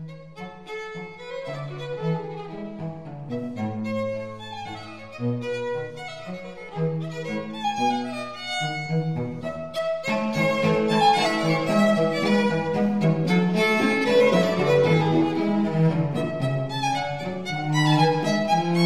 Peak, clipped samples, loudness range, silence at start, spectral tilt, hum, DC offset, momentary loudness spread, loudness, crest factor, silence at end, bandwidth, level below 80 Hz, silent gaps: -8 dBFS; under 0.1%; 11 LU; 0 s; -6 dB/octave; none; 0.4%; 16 LU; -23 LUFS; 16 dB; 0 s; 13 kHz; -60 dBFS; none